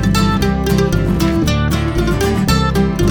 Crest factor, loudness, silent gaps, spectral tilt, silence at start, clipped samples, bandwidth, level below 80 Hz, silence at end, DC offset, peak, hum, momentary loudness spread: 12 dB; -15 LUFS; none; -6 dB/octave; 0 s; under 0.1%; over 20 kHz; -22 dBFS; 0 s; under 0.1%; -2 dBFS; none; 2 LU